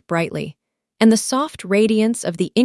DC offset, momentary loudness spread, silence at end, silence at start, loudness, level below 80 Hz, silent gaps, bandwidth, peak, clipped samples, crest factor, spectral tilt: under 0.1%; 10 LU; 0 s; 0.1 s; -18 LUFS; -60 dBFS; none; 12 kHz; 0 dBFS; under 0.1%; 18 dB; -5 dB/octave